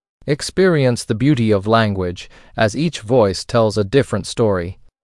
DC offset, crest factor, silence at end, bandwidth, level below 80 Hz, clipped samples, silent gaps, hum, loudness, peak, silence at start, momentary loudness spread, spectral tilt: under 0.1%; 16 dB; 0.3 s; 12 kHz; -46 dBFS; under 0.1%; none; none; -17 LUFS; 0 dBFS; 0.25 s; 9 LU; -6 dB/octave